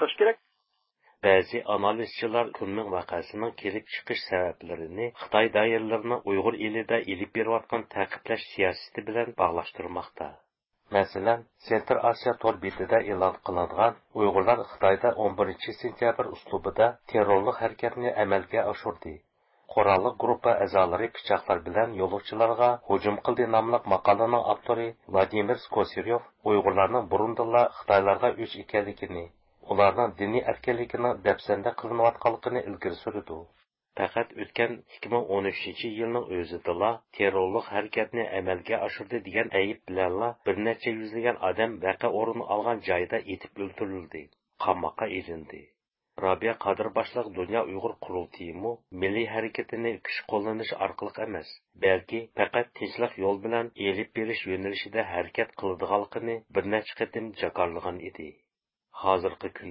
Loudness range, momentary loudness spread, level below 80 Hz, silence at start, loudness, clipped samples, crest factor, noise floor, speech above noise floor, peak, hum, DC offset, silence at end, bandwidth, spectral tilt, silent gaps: 6 LU; 11 LU; -58 dBFS; 0 s; -28 LUFS; under 0.1%; 22 dB; -76 dBFS; 49 dB; -6 dBFS; none; under 0.1%; 0 s; 5.8 kHz; -9.5 dB/octave; none